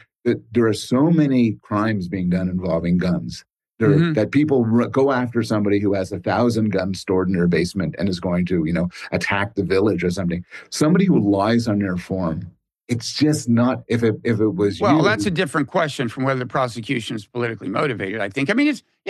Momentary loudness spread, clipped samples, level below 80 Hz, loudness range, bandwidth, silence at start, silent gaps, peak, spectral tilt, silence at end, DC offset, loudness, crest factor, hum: 8 LU; under 0.1%; -50 dBFS; 2 LU; 12.5 kHz; 0.25 s; none; -4 dBFS; -6.5 dB/octave; 0 s; under 0.1%; -20 LUFS; 16 dB; none